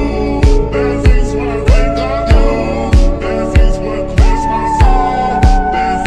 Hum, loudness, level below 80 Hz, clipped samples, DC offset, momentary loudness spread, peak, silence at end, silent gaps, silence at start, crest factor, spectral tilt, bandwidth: none; -13 LUFS; -12 dBFS; under 0.1%; under 0.1%; 4 LU; 0 dBFS; 0 s; none; 0 s; 10 dB; -7 dB/octave; 9.6 kHz